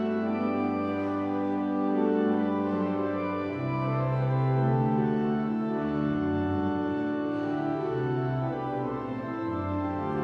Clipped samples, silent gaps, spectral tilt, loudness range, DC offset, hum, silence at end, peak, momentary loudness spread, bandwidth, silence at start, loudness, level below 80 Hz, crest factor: under 0.1%; none; -10 dB/octave; 3 LU; under 0.1%; none; 0 s; -14 dBFS; 5 LU; 5.6 kHz; 0 s; -29 LUFS; -58 dBFS; 14 dB